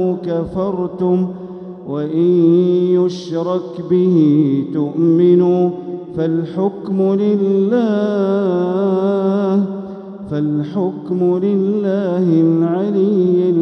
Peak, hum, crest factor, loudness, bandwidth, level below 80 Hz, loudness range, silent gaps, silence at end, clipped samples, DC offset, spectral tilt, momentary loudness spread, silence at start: -2 dBFS; none; 12 dB; -16 LUFS; 6.4 kHz; -54 dBFS; 3 LU; none; 0 s; under 0.1%; under 0.1%; -9.5 dB/octave; 10 LU; 0 s